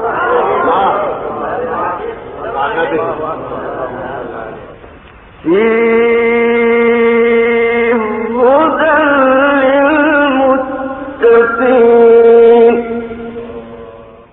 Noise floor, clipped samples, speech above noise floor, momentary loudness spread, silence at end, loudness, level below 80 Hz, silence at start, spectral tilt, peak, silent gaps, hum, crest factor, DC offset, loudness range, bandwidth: -36 dBFS; under 0.1%; 24 dB; 17 LU; 0.2 s; -10 LUFS; -44 dBFS; 0 s; -9.5 dB/octave; 0 dBFS; none; none; 10 dB; under 0.1%; 10 LU; 3.9 kHz